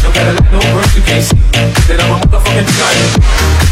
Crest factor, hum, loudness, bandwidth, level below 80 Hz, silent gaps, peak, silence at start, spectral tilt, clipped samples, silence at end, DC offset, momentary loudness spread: 8 dB; none; -9 LUFS; 15.5 kHz; -10 dBFS; none; 0 dBFS; 0 s; -4.5 dB/octave; 0.1%; 0 s; under 0.1%; 1 LU